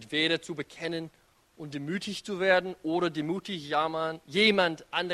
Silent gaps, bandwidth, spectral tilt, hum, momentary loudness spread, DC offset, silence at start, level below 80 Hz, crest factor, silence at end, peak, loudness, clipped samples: none; 13.5 kHz; -4.5 dB/octave; none; 15 LU; under 0.1%; 0 s; -68 dBFS; 20 dB; 0 s; -10 dBFS; -29 LUFS; under 0.1%